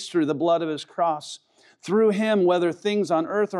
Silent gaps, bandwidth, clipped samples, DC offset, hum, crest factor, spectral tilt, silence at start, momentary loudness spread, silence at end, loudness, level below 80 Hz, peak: none; 11.5 kHz; under 0.1%; under 0.1%; none; 14 dB; -5.5 dB/octave; 0 s; 12 LU; 0 s; -23 LUFS; -86 dBFS; -10 dBFS